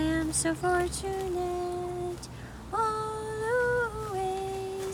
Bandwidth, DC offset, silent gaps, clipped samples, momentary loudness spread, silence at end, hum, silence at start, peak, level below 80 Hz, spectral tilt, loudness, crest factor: 18.5 kHz; under 0.1%; none; under 0.1%; 8 LU; 0 s; none; 0 s; -16 dBFS; -46 dBFS; -4.5 dB/octave; -31 LUFS; 16 dB